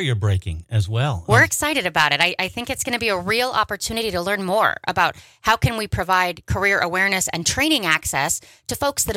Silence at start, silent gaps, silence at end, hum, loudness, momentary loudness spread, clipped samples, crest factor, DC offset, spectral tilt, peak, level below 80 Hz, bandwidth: 0 s; none; 0 s; none; -20 LUFS; 8 LU; under 0.1%; 18 dB; under 0.1%; -3.5 dB/octave; -2 dBFS; -42 dBFS; 16.5 kHz